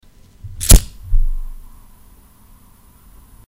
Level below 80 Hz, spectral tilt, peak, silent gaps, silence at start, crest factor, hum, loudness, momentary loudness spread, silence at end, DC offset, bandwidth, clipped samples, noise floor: -18 dBFS; -3.5 dB/octave; 0 dBFS; none; 0.45 s; 18 dB; none; -16 LUFS; 27 LU; 1.9 s; under 0.1%; 17 kHz; 0.2%; -47 dBFS